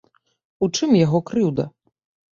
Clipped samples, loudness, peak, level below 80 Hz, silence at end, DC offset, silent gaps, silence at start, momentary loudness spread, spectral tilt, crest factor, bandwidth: under 0.1%; -20 LUFS; -6 dBFS; -58 dBFS; 0.65 s; under 0.1%; none; 0.6 s; 10 LU; -6 dB/octave; 16 dB; 7.6 kHz